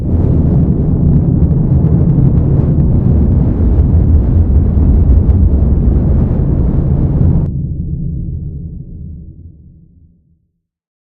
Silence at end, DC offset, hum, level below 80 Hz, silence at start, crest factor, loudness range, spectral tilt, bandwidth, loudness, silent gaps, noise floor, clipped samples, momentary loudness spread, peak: 1.55 s; under 0.1%; none; -16 dBFS; 0 s; 10 dB; 9 LU; -13.5 dB/octave; 2.1 kHz; -12 LUFS; none; -65 dBFS; 0.1%; 12 LU; 0 dBFS